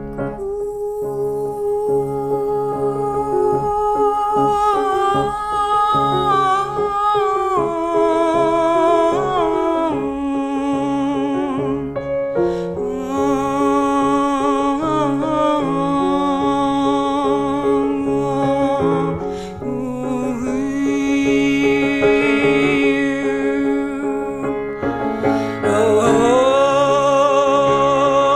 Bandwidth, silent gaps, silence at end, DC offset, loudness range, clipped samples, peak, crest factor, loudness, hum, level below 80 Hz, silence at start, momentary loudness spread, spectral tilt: 14.5 kHz; none; 0 s; under 0.1%; 4 LU; under 0.1%; -2 dBFS; 14 dB; -18 LUFS; none; -44 dBFS; 0 s; 8 LU; -6 dB/octave